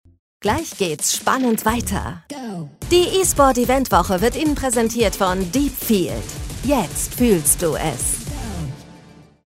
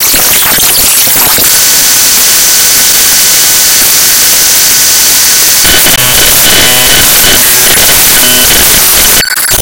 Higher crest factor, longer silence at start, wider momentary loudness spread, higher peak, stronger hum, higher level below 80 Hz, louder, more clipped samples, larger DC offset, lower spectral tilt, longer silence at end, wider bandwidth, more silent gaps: first, 20 dB vs 4 dB; first, 0.4 s vs 0 s; first, 15 LU vs 1 LU; about the same, 0 dBFS vs 0 dBFS; neither; second, -34 dBFS vs -26 dBFS; second, -19 LUFS vs -1 LUFS; second, under 0.1% vs 20%; neither; first, -4 dB/octave vs 0.5 dB/octave; first, 0.25 s vs 0 s; second, 16.5 kHz vs over 20 kHz; neither